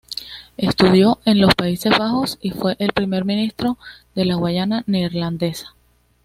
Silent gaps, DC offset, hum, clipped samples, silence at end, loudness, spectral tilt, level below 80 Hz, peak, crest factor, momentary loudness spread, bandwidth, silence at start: none; under 0.1%; none; under 0.1%; 0.55 s; -18 LUFS; -6 dB/octave; -46 dBFS; 0 dBFS; 18 dB; 13 LU; 15.5 kHz; 0.1 s